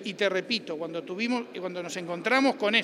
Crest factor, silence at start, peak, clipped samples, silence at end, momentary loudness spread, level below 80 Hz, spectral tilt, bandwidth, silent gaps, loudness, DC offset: 20 dB; 0 s; -8 dBFS; under 0.1%; 0 s; 11 LU; -82 dBFS; -4 dB/octave; 13.5 kHz; none; -28 LUFS; under 0.1%